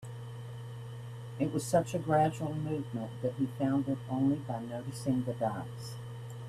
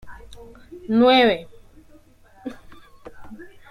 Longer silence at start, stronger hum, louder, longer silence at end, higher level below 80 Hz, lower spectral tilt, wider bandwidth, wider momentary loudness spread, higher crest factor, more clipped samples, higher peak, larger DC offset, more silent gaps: about the same, 0 s vs 0.05 s; first, 60 Hz at -45 dBFS vs none; second, -34 LUFS vs -17 LUFS; second, 0 s vs 0.25 s; second, -64 dBFS vs -52 dBFS; about the same, -7 dB/octave vs -6 dB/octave; first, 14.5 kHz vs 13 kHz; second, 14 LU vs 28 LU; about the same, 18 dB vs 20 dB; neither; second, -14 dBFS vs -4 dBFS; neither; neither